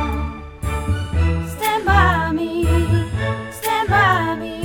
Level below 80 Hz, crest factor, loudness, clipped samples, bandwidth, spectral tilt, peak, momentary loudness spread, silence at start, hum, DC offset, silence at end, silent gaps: -26 dBFS; 18 dB; -19 LUFS; under 0.1%; over 20 kHz; -6 dB/octave; -2 dBFS; 10 LU; 0 s; none; under 0.1%; 0 s; none